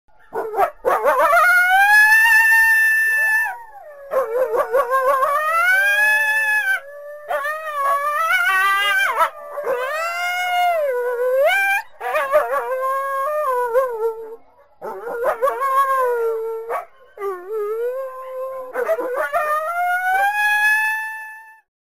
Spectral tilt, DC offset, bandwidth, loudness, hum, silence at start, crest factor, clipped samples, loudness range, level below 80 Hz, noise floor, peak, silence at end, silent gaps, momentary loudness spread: 0 dB/octave; 0.4%; 16 kHz; -17 LUFS; none; 0.3 s; 14 dB; under 0.1%; 9 LU; -62 dBFS; -44 dBFS; -6 dBFS; 0.4 s; none; 16 LU